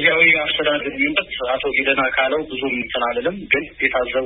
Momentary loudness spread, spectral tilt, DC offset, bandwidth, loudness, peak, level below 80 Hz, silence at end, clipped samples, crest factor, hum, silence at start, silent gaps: 9 LU; -8.5 dB/octave; under 0.1%; 4 kHz; -18 LUFS; -2 dBFS; -48 dBFS; 0 s; under 0.1%; 18 dB; none; 0 s; none